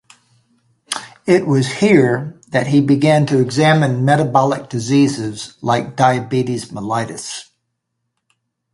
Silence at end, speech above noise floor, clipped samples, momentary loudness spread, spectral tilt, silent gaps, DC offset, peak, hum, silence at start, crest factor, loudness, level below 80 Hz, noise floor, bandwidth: 1.3 s; 59 dB; under 0.1%; 12 LU; -6 dB/octave; none; under 0.1%; 0 dBFS; none; 0.9 s; 16 dB; -16 LUFS; -56 dBFS; -74 dBFS; 11.5 kHz